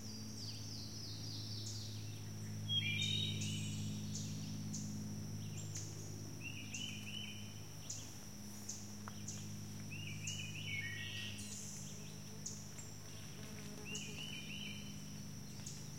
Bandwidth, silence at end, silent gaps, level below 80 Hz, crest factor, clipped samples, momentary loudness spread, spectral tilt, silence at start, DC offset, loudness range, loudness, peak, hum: 16.5 kHz; 0 s; none; -66 dBFS; 18 dB; under 0.1%; 10 LU; -3 dB/octave; 0 s; 0.2%; 7 LU; -45 LUFS; -28 dBFS; none